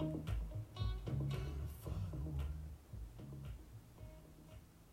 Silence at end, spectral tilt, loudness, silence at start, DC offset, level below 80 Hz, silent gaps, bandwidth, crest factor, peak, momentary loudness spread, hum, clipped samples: 0 s; -7.5 dB/octave; -46 LUFS; 0 s; under 0.1%; -50 dBFS; none; 16 kHz; 14 dB; -30 dBFS; 17 LU; none; under 0.1%